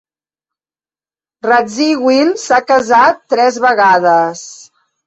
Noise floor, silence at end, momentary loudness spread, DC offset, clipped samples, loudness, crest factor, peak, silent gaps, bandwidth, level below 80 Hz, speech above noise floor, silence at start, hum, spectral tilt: under -90 dBFS; 0.5 s; 9 LU; under 0.1%; under 0.1%; -11 LUFS; 12 dB; 0 dBFS; none; 8.2 kHz; -58 dBFS; over 79 dB; 1.45 s; none; -3.5 dB/octave